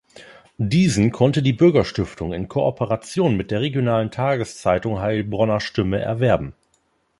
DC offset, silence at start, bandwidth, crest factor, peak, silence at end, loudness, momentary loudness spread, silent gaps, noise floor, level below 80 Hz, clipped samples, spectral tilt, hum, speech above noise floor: under 0.1%; 0.2 s; 11.5 kHz; 18 dB; -2 dBFS; 0.7 s; -20 LUFS; 9 LU; none; -65 dBFS; -44 dBFS; under 0.1%; -6.5 dB/octave; none; 46 dB